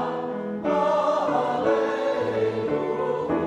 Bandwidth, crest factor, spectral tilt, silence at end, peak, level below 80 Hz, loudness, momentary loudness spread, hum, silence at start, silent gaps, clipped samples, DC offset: 10.5 kHz; 14 dB; -6.5 dB/octave; 0 s; -10 dBFS; -60 dBFS; -24 LUFS; 6 LU; none; 0 s; none; under 0.1%; under 0.1%